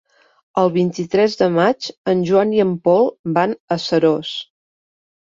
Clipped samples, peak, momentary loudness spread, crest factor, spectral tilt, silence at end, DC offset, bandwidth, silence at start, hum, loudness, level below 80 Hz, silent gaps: under 0.1%; -2 dBFS; 7 LU; 16 dB; -6.5 dB/octave; 0.8 s; under 0.1%; 7.6 kHz; 0.55 s; none; -17 LUFS; -60 dBFS; 1.97-2.04 s, 3.19-3.24 s, 3.60-3.68 s